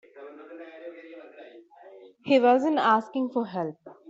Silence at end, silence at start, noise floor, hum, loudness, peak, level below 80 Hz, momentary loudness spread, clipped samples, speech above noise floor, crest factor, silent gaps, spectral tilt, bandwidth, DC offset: 0.2 s; 0.15 s; -50 dBFS; none; -24 LUFS; -10 dBFS; -78 dBFS; 25 LU; under 0.1%; 27 dB; 18 dB; none; -6 dB/octave; 7.8 kHz; under 0.1%